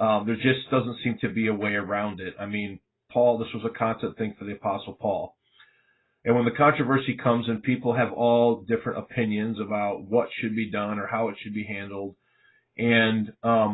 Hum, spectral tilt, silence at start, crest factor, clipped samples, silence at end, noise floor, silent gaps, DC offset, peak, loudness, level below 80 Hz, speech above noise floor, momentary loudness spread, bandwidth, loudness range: none; -11 dB/octave; 0 s; 20 dB; under 0.1%; 0 s; -67 dBFS; none; under 0.1%; -6 dBFS; -26 LUFS; -60 dBFS; 42 dB; 11 LU; 4.1 kHz; 5 LU